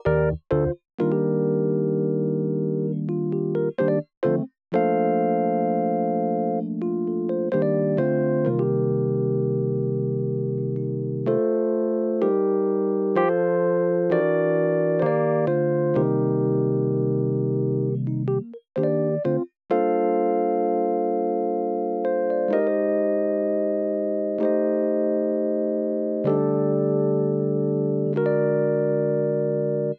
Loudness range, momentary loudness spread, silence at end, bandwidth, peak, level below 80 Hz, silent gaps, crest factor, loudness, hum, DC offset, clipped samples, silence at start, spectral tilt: 2 LU; 4 LU; 0 s; 4.4 kHz; -8 dBFS; -54 dBFS; 0.94-0.98 s, 4.17-4.21 s; 14 dB; -23 LUFS; none; under 0.1%; under 0.1%; 0.05 s; -12 dB/octave